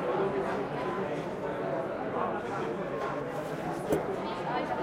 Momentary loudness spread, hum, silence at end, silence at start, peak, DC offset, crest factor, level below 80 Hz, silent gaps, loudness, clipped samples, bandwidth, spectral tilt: 4 LU; none; 0 s; 0 s; -14 dBFS; under 0.1%; 18 dB; -60 dBFS; none; -33 LUFS; under 0.1%; 16 kHz; -6.5 dB/octave